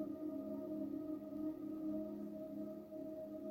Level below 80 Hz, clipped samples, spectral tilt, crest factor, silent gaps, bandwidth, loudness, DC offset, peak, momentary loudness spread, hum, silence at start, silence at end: -76 dBFS; under 0.1%; -9 dB/octave; 12 dB; none; 16.5 kHz; -46 LUFS; under 0.1%; -32 dBFS; 4 LU; none; 0 s; 0 s